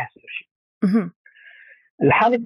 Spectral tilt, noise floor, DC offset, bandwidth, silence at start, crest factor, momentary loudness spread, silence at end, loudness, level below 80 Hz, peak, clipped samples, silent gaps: -8.5 dB/octave; -48 dBFS; under 0.1%; 11 kHz; 0 s; 16 dB; 18 LU; 0 s; -20 LUFS; -62 dBFS; -6 dBFS; under 0.1%; 0.51-0.81 s, 1.16-1.25 s, 1.90-1.98 s